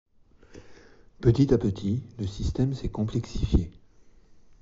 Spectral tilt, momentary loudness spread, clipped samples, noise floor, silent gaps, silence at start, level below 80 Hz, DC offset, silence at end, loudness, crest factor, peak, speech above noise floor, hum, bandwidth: -9 dB/octave; 9 LU; under 0.1%; -54 dBFS; none; 0.5 s; -36 dBFS; under 0.1%; 0.9 s; -27 LUFS; 20 dB; -8 dBFS; 29 dB; none; 7.8 kHz